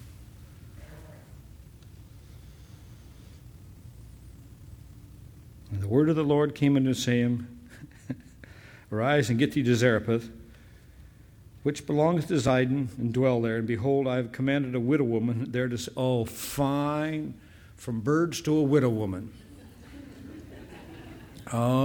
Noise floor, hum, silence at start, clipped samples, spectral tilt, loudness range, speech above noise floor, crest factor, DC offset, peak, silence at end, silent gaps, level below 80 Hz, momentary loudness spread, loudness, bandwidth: -52 dBFS; none; 0 s; under 0.1%; -6.5 dB/octave; 3 LU; 26 dB; 20 dB; under 0.1%; -8 dBFS; 0 s; none; -54 dBFS; 25 LU; -27 LUFS; over 20 kHz